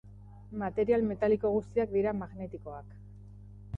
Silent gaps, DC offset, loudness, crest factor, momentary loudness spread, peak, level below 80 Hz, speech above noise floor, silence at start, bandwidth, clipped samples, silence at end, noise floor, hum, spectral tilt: none; under 0.1%; -31 LUFS; 16 dB; 23 LU; -16 dBFS; -52 dBFS; 19 dB; 0.05 s; 7.2 kHz; under 0.1%; 0 s; -49 dBFS; 50 Hz at -45 dBFS; -9.5 dB/octave